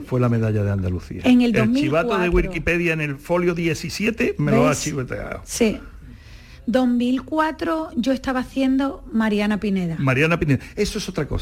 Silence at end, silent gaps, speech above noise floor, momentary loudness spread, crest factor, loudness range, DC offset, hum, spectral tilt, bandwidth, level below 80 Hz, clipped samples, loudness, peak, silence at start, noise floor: 0 s; none; 22 dB; 7 LU; 14 dB; 3 LU; under 0.1%; none; -6 dB/octave; 16 kHz; -38 dBFS; under 0.1%; -21 LUFS; -6 dBFS; 0 s; -42 dBFS